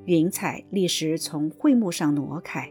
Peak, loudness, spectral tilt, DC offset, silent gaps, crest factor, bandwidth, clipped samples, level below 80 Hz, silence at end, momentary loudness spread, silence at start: -10 dBFS; -24 LUFS; -5 dB/octave; under 0.1%; none; 14 dB; 18.5 kHz; under 0.1%; -68 dBFS; 0 s; 8 LU; 0 s